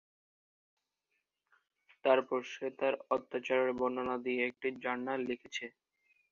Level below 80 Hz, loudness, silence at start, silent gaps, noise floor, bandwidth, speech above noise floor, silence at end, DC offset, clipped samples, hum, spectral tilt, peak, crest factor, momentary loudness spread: -78 dBFS; -35 LUFS; 2.05 s; none; -85 dBFS; 7.2 kHz; 50 dB; 0.6 s; under 0.1%; under 0.1%; none; -2 dB/octave; -14 dBFS; 22 dB; 10 LU